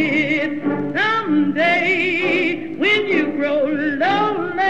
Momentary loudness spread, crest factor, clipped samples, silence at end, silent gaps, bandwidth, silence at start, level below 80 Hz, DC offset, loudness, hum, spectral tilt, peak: 4 LU; 12 dB; under 0.1%; 0 s; none; 8 kHz; 0 s; -58 dBFS; 0.8%; -18 LUFS; none; -5.5 dB/octave; -6 dBFS